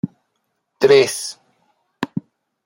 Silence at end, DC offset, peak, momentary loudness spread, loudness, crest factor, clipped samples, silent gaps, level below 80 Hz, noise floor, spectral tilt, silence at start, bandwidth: 0.45 s; under 0.1%; -2 dBFS; 17 LU; -17 LUFS; 20 dB; under 0.1%; none; -66 dBFS; -72 dBFS; -4 dB/octave; 0.05 s; 16.5 kHz